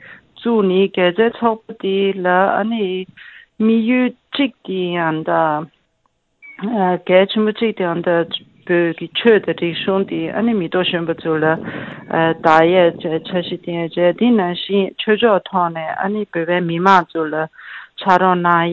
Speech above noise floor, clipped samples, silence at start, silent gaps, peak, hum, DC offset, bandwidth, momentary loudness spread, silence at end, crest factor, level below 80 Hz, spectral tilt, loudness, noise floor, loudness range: 49 dB; under 0.1%; 0.05 s; none; 0 dBFS; none; under 0.1%; 7.4 kHz; 10 LU; 0 s; 16 dB; -60 dBFS; -7.5 dB/octave; -17 LUFS; -65 dBFS; 3 LU